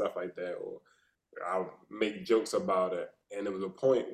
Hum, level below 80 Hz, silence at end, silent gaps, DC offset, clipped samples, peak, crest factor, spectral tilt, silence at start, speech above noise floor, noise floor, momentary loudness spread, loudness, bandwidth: none; -76 dBFS; 0 s; none; under 0.1%; under 0.1%; -14 dBFS; 18 dB; -5 dB/octave; 0 s; 40 dB; -70 dBFS; 13 LU; -33 LUFS; 13.5 kHz